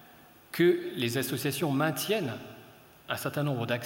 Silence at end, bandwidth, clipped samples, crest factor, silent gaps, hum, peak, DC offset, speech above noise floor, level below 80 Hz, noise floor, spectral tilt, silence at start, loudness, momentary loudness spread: 0 s; 17 kHz; under 0.1%; 20 dB; none; none; -12 dBFS; under 0.1%; 26 dB; -72 dBFS; -55 dBFS; -5 dB/octave; 0 s; -30 LUFS; 12 LU